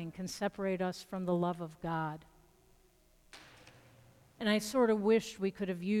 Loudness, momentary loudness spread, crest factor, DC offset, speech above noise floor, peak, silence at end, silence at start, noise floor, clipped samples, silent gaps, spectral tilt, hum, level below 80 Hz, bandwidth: -34 LUFS; 12 LU; 16 dB; under 0.1%; 33 dB; -20 dBFS; 0 s; 0 s; -67 dBFS; under 0.1%; none; -5.5 dB/octave; none; -66 dBFS; 16 kHz